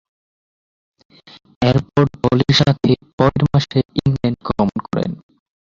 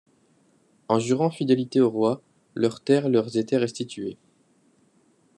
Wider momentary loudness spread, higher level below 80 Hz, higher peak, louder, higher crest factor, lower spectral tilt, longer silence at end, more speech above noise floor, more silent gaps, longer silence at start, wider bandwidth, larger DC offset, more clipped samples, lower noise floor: second, 9 LU vs 13 LU; first, -42 dBFS vs -74 dBFS; first, -2 dBFS vs -6 dBFS; first, -17 LUFS vs -24 LUFS; about the same, 16 dB vs 20 dB; about the same, -7 dB/octave vs -6.5 dB/octave; second, 0.45 s vs 1.25 s; first, over 74 dB vs 40 dB; first, 3.13-3.18 s vs none; first, 1.6 s vs 0.9 s; second, 7.6 kHz vs 10.5 kHz; neither; neither; first, under -90 dBFS vs -63 dBFS